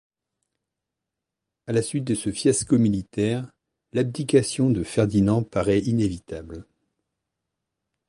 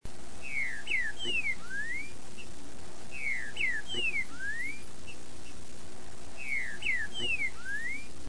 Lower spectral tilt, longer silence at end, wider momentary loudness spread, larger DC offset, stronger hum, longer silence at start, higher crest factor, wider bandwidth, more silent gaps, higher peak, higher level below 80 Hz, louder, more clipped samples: first, -6 dB/octave vs -2 dB/octave; first, 1.45 s vs 0 s; about the same, 16 LU vs 17 LU; second, under 0.1% vs 3%; second, none vs 60 Hz at -60 dBFS; first, 1.65 s vs 0 s; about the same, 20 dB vs 16 dB; about the same, 11.5 kHz vs 10.5 kHz; neither; first, -4 dBFS vs -20 dBFS; first, -50 dBFS vs -56 dBFS; first, -23 LUFS vs -33 LUFS; neither